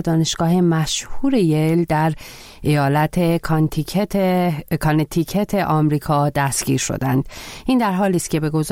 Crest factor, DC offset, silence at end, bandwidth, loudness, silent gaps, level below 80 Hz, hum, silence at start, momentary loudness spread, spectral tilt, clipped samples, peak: 12 dB; 0.2%; 0 s; 16.5 kHz; -19 LUFS; none; -40 dBFS; none; 0 s; 5 LU; -5.5 dB/octave; under 0.1%; -6 dBFS